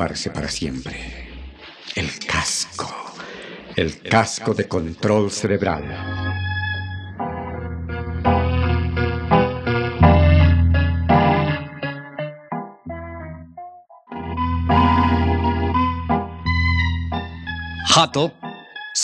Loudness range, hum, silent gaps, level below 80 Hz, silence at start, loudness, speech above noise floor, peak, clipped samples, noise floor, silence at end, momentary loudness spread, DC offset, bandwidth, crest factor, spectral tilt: 8 LU; none; none; -34 dBFS; 0 s; -20 LUFS; 19 dB; -2 dBFS; under 0.1%; -41 dBFS; 0 s; 18 LU; under 0.1%; 11 kHz; 20 dB; -5 dB/octave